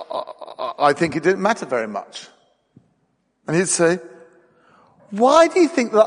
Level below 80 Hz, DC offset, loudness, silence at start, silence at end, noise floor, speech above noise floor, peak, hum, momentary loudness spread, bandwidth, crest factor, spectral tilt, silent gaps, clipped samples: -64 dBFS; under 0.1%; -18 LUFS; 0 s; 0 s; -67 dBFS; 50 dB; -2 dBFS; none; 19 LU; 10 kHz; 18 dB; -4 dB/octave; none; under 0.1%